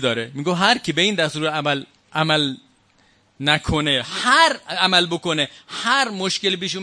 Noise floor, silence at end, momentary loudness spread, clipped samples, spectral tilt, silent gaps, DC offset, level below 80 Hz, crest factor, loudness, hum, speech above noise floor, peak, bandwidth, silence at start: -58 dBFS; 0 s; 9 LU; under 0.1%; -3.5 dB/octave; none; under 0.1%; -46 dBFS; 20 dB; -19 LUFS; none; 38 dB; 0 dBFS; 11 kHz; 0 s